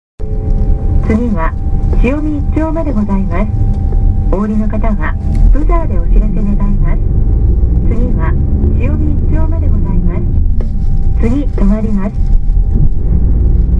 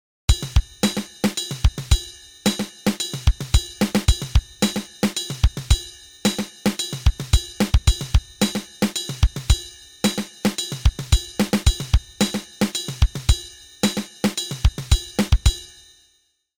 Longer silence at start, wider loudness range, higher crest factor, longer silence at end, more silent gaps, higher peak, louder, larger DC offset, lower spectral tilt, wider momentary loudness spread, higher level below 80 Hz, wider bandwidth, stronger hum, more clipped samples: about the same, 0.2 s vs 0.3 s; about the same, 1 LU vs 1 LU; second, 10 dB vs 18 dB; second, 0 s vs 0.9 s; neither; about the same, 0 dBFS vs -2 dBFS; first, -14 LUFS vs -23 LUFS; neither; first, -10.5 dB/octave vs -4.5 dB/octave; about the same, 3 LU vs 4 LU; first, -10 dBFS vs -24 dBFS; second, 3.1 kHz vs over 20 kHz; neither; neither